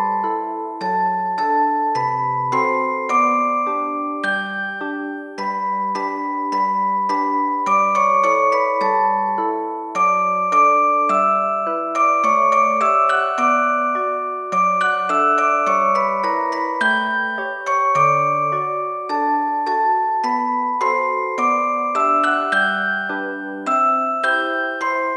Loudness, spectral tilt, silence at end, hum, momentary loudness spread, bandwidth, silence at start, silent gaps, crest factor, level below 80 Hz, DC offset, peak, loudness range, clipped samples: -18 LUFS; -4.5 dB/octave; 0 s; none; 8 LU; 11 kHz; 0 s; none; 14 dB; -78 dBFS; under 0.1%; -4 dBFS; 4 LU; under 0.1%